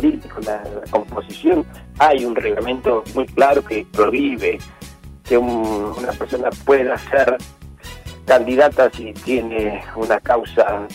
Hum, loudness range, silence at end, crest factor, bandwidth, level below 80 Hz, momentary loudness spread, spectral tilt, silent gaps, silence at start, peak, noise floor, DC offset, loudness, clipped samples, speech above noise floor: none; 2 LU; 0 s; 16 dB; 16 kHz; -40 dBFS; 15 LU; -5.5 dB/octave; none; 0 s; -2 dBFS; -38 dBFS; under 0.1%; -18 LUFS; under 0.1%; 20 dB